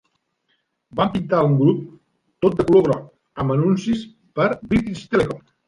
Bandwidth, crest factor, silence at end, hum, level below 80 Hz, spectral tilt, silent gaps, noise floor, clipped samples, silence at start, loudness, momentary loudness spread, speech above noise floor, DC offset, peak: 11 kHz; 16 dB; 0.3 s; none; -48 dBFS; -8 dB/octave; none; -70 dBFS; under 0.1%; 0.95 s; -20 LUFS; 11 LU; 51 dB; under 0.1%; -4 dBFS